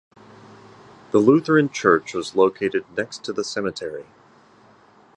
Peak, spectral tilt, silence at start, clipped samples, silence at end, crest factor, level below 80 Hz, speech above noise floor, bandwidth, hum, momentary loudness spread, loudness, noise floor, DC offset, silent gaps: -2 dBFS; -5.5 dB/octave; 1.15 s; under 0.1%; 1.15 s; 20 dB; -62 dBFS; 32 dB; 10.5 kHz; none; 12 LU; -21 LUFS; -53 dBFS; under 0.1%; none